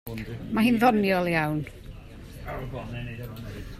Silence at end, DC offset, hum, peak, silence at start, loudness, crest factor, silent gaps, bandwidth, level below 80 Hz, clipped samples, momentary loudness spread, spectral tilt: 0 s; under 0.1%; none; -8 dBFS; 0.05 s; -26 LUFS; 20 dB; none; 16 kHz; -46 dBFS; under 0.1%; 23 LU; -6.5 dB/octave